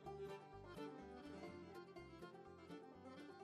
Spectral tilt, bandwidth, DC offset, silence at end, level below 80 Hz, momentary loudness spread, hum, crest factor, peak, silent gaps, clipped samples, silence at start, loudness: -6.5 dB/octave; 13 kHz; under 0.1%; 0 s; -74 dBFS; 5 LU; none; 14 dB; -42 dBFS; none; under 0.1%; 0 s; -57 LUFS